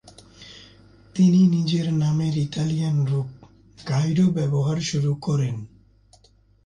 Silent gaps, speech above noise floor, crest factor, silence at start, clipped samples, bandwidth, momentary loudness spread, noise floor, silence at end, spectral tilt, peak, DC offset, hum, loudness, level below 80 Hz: none; 36 dB; 14 dB; 0.05 s; under 0.1%; 10 kHz; 17 LU; -57 dBFS; 1 s; -7 dB/octave; -8 dBFS; under 0.1%; none; -22 LUFS; -56 dBFS